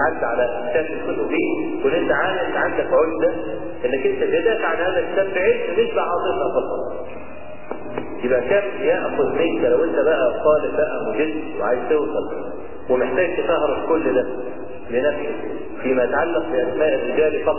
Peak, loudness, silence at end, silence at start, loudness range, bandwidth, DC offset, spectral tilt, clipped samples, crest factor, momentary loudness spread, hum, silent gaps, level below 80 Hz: -4 dBFS; -21 LUFS; 0 s; 0 s; 3 LU; 3.1 kHz; 3%; -9 dB/octave; under 0.1%; 16 dB; 11 LU; none; none; -48 dBFS